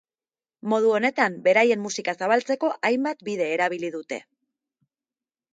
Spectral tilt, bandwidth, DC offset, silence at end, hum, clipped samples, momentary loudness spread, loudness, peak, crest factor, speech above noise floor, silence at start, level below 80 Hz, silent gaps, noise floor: -4 dB/octave; 9.2 kHz; under 0.1%; 1.3 s; none; under 0.1%; 12 LU; -23 LUFS; -6 dBFS; 18 dB; over 67 dB; 0.65 s; -78 dBFS; none; under -90 dBFS